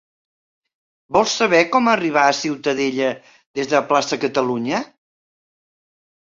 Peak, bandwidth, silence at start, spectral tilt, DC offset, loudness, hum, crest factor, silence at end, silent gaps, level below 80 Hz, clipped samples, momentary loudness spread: -2 dBFS; 7.8 kHz; 1.1 s; -3.5 dB/octave; under 0.1%; -18 LUFS; none; 20 dB; 1.55 s; 3.46-3.54 s; -60 dBFS; under 0.1%; 10 LU